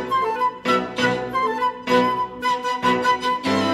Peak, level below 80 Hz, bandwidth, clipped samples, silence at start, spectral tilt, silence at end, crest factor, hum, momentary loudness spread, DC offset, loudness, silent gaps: -4 dBFS; -56 dBFS; 14.5 kHz; under 0.1%; 0 s; -4.5 dB/octave; 0 s; 16 dB; none; 4 LU; under 0.1%; -21 LUFS; none